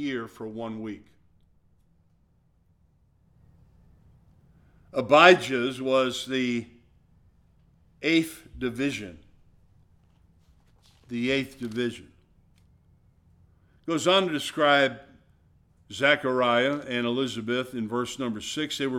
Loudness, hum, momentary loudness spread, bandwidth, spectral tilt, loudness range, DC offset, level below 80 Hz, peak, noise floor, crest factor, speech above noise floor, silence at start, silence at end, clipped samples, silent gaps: -25 LUFS; none; 16 LU; 17 kHz; -4 dB/octave; 10 LU; under 0.1%; -62 dBFS; -2 dBFS; -65 dBFS; 26 dB; 39 dB; 0 s; 0 s; under 0.1%; none